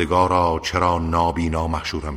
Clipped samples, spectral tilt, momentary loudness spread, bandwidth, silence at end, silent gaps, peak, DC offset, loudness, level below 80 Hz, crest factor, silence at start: under 0.1%; -6 dB/octave; 6 LU; 14 kHz; 0 s; none; -4 dBFS; under 0.1%; -20 LUFS; -34 dBFS; 16 dB; 0 s